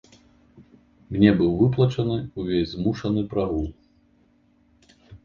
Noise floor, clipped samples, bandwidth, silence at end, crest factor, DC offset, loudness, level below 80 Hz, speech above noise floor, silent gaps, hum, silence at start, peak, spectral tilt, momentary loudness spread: -61 dBFS; under 0.1%; 7.2 kHz; 0.1 s; 22 dB; under 0.1%; -23 LUFS; -44 dBFS; 39 dB; none; none; 0.6 s; -2 dBFS; -8.5 dB/octave; 10 LU